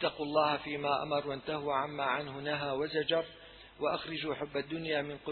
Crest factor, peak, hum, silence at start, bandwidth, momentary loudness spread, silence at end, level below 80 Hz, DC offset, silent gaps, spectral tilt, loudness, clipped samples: 18 dB; -16 dBFS; none; 0 s; 4.5 kHz; 6 LU; 0 s; -66 dBFS; under 0.1%; none; -8 dB/octave; -34 LUFS; under 0.1%